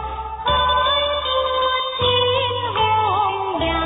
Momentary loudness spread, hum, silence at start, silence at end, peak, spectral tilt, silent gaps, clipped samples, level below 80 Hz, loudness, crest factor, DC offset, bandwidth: 5 LU; none; 0 s; 0 s; -6 dBFS; -9 dB/octave; none; under 0.1%; -36 dBFS; -19 LUFS; 14 dB; under 0.1%; 4 kHz